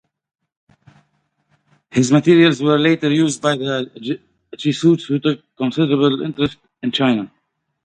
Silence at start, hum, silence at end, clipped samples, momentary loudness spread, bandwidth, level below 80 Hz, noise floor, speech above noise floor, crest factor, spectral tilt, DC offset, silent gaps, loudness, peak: 1.95 s; none; 0.55 s; under 0.1%; 12 LU; 10 kHz; -58 dBFS; -70 dBFS; 54 dB; 18 dB; -5.5 dB/octave; under 0.1%; none; -17 LUFS; 0 dBFS